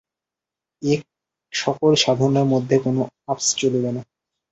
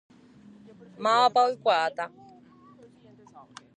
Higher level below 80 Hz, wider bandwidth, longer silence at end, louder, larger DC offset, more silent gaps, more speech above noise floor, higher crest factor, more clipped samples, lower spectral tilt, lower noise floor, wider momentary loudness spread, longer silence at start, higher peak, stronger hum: first, -60 dBFS vs -78 dBFS; second, 8.2 kHz vs 10 kHz; second, 0.5 s vs 1.7 s; first, -20 LUFS vs -25 LUFS; neither; neither; first, 68 dB vs 30 dB; about the same, 18 dB vs 20 dB; neither; first, -4.5 dB/octave vs -3 dB/octave; first, -87 dBFS vs -54 dBFS; second, 10 LU vs 14 LU; second, 0.8 s vs 1 s; first, -4 dBFS vs -8 dBFS; neither